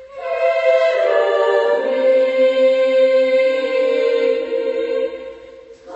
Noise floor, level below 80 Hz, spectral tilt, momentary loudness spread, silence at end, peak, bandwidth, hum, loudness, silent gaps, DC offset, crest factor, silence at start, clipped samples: -40 dBFS; -62 dBFS; -3 dB/octave; 7 LU; 0 s; -4 dBFS; 8 kHz; none; -16 LUFS; none; under 0.1%; 12 dB; 0 s; under 0.1%